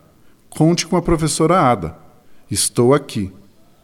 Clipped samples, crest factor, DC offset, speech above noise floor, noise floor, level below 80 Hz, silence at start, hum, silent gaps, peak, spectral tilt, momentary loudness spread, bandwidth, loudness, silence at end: under 0.1%; 16 dB; under 0.1%; 33 dB; -49 dBFS; -38 dBFS; 0.55 s; none; none; -2 dBFS; -5 dB/octave; 13 LU; 16.5 kHz; -17 LUFS; 0.5 s